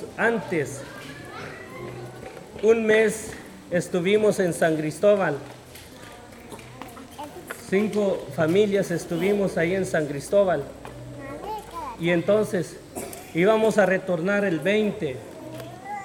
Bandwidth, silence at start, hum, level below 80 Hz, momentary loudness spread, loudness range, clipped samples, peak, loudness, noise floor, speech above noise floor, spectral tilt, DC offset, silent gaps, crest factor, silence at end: 18 kHz; 0 s; none; -56 dBFS; 20 LU; 4 LU; under 0.1%; -6 dBFS; -23 LUFS; -43 dBFS; 21 dB; -5.5 dB/octave; under 0.1%; none; 18 dB; 0 s